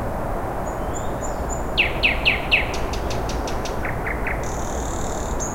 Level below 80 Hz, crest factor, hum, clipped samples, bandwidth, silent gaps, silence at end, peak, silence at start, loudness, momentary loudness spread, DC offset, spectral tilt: -30 dBFS; 18 dB; none; under 0.1%; 17 kHz; none; 0 s; -6 dBFS; 0 s; -23 LUFS; 9 LU; under 0.1%; -3.5 dB/octave